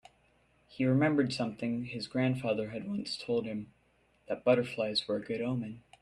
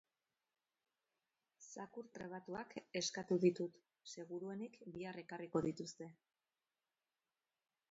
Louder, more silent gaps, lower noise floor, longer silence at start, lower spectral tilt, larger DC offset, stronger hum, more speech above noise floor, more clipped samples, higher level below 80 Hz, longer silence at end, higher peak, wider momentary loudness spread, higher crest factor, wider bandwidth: first, -32 LUFS vs -44 LUFS; neither; second, -69 dBFS vs under -90 dBFS; second, 0.7 s vs 1.6 s; first, -6.5 dB/octave vs -5 dB/octave; neither; neither; second, 37 dB vs over 46 dB; neither; first, -68 dBFS vs -82 dBFS; second, 0.2 s vs 1.8 s; first, -14 dBFS vs -22 dBFS; second, 10 LU vs 19 LU; about the same, 20 dB vs 24 dB; first, 11.5 kHz vs 7.6 kHz